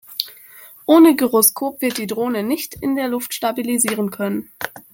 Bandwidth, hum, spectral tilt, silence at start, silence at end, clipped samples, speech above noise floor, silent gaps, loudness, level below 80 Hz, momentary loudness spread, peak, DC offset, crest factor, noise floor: 17 kHz; none; -3.5 dB/octave; 0.1 s; 0.15 s; under 0.1%; 26 dB; none; -18 LUFS; -60 dBFS; 15 LU; 0 dBFS; under 0.1%; 18 dB; -43 dBFS